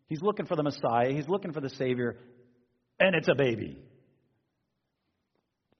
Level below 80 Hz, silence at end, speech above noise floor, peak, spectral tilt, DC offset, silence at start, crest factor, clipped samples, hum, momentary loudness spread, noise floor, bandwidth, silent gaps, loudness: -68 dBFS; 2 s; 52 dB; -8 dBFS; -4.5 dB/octave; under 0.1%; 0.1 s; 22 dB; under 0.1%; none; 11 LU; -80 dBFS; 6.4 kHz; none; -29 LUFS